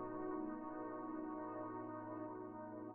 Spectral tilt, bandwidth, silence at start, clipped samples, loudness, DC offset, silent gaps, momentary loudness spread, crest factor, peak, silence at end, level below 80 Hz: -3.5 dB/octave; 3.1 kHz; 0 s; under 0.1%; -48 LUFS; under 0.1%; none; 5 LU; 14 dB; -34 dBFS; 0 s; -76 dBFS